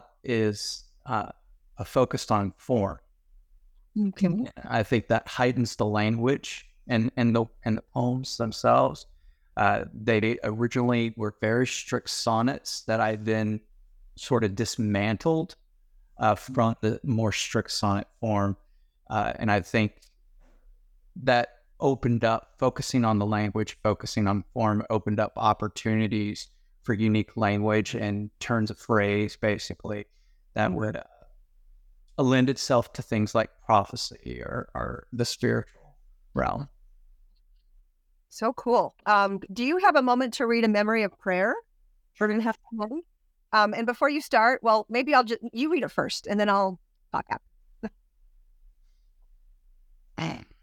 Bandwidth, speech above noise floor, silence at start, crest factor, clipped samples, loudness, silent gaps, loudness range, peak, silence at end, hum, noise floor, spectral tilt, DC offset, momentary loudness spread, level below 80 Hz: 16 kHz; 40 dB; 0.25 s; 20 dB; under 0.1%; -26 LUFS; none; 6 LU; -6 dBFS; 0.2 s; none; -65 dBFS; -5.5 dB/octave; under 0.1%; 12 LU; -54 dBFS